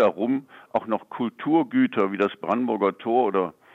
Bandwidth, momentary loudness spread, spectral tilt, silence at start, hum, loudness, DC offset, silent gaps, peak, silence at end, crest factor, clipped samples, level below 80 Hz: 4.2 kHz; 8 LU; -8 dB/octave; 0 s; none; -24 LUFS; under 0.1%; none; -8 dBFS; 0.25 s; 16 dB; under 0.1%; -74 dBFS